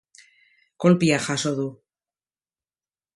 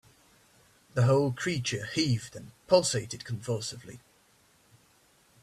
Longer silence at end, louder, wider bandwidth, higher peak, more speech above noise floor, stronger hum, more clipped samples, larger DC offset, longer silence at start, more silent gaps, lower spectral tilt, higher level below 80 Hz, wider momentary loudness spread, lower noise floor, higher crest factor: about the same, 1.4 s vs 1.45 s; first, -22 LUFS vs -29 LUFS; second, 11.5 kHz vs 13.5 kHz; first, -6 dBFS vs -10 dBFS; first, over 69 dB vs 35 dB; neither; neither; neither; second, 0.8 s vs 0.95 s; neither; about the same, -5.5 dB/octave vs -5 dB/octave; about the same, -64 dBFS vs -64 dBFS; second, 11 LU vs 19 LU; first, under -90 dBFS vs -64 dBFS; about the same, 20 dB vs 22 dB